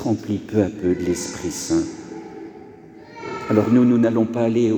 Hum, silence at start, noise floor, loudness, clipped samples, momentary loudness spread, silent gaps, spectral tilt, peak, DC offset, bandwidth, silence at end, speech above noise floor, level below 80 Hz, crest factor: none; 0 s; -42 dBFS; -20 LUFS; under 0.1%; 20 LU; none; -6.5 dB/octave; -2 dBFS; under 0.1%; 19.5 kHz; 0 s; 23 dB; -52 dBFS; 18 dB